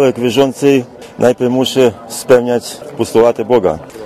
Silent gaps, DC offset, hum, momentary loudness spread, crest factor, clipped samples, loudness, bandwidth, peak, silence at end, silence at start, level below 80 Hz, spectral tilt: none; under 0.1%; none; 8 LU; 12 dB; 0.3%; -13 LUFS; 15.5 kHz; 0 dBFS; 0 s; 0 s; -46 dBFS; -5 dB/octave